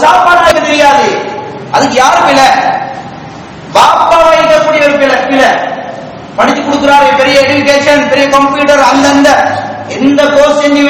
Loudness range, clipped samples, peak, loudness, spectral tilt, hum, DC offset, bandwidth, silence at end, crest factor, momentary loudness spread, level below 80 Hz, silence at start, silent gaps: 2 LU; 7%; 0 dBFS; -6 LUFS; -3.5 dB/octave; none; under 0.1%; 18.5 kHz; 0 s; 6 dB; 14 LU; -40 dBFS; 0 s; none